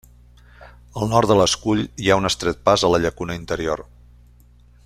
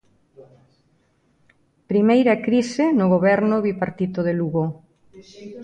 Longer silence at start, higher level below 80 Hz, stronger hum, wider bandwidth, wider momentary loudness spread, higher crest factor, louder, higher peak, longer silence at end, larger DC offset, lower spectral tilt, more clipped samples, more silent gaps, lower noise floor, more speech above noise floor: first, 0.6 s vs 0.4 s; first, -42 dBFS vs -62 dBFS; first, 60 Hz at -40 dBFS vs none; first, 15 kHz vs 9.6 kHz; about the same, 11 LU vs 11 LU; about the same, 20 dB vs 16 dB; about the same, -19 LUFS vs -20 LUFS; about the same, -2 dBFS vs -4 dBFS; first, 1.05 s vs 0 s; neither; second, -4.5 dB/octave vs -7.5 dB/octave; neither; neither; second, -50 dBFS vs -63 dBFS; second, 31 dB vs 44 dB